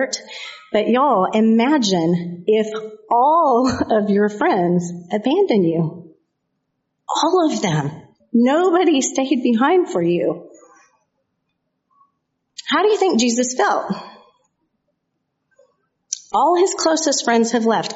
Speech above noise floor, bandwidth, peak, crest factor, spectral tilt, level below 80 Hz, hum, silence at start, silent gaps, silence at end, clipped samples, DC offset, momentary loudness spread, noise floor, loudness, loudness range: 57 dB; 8 kHz; -4 dBFS; 16 dB; -4.5 dB/octave; -60 dBFS; none; 0 s; none; 0 s; under 0.1%; under 0.1%; 11 LU; -74 dBFS; -17 LUFS; 6 LU